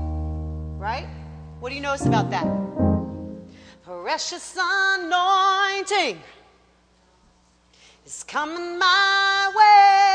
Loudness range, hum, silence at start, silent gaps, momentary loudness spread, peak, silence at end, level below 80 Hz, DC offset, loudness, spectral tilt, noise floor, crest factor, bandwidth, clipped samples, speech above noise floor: 6 LU; none; 0 s; none; 21 LU; -4 dBFS; 0 s; -40 dBFS; under 0.1%; -20 LUFS; -4 dB/octave; -59 dBFS; 18 dB; 10 kHz; under 0.1%; 37 dB